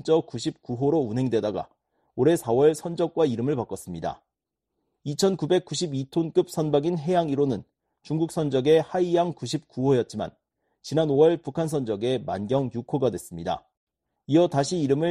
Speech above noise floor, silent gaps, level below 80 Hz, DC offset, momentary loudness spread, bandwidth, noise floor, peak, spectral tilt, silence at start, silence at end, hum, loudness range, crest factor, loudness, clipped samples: 60 dB; 13.77-13.87 s; -60 dBFS; under 0.1%; 12 LU; 13 kHz; -84 dBFS; -6 dBFS; -6.5 dB/octave; 0.05 s; 0 s; none; 3 LU; 18 dB; -25 LUFS; under 0.1%